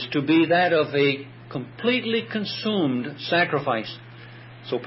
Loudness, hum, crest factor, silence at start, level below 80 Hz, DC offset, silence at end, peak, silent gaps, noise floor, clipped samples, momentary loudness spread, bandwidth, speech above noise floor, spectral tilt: -23 LUFS; none; 16 dB; 0 s; -68 dBFS; under 0.1%; 0 s; -8 dBFS; none; -43 dBFS; under 0.1%; 19 LU; 5.8 kHz; 20 dB; -9.5 dB/octave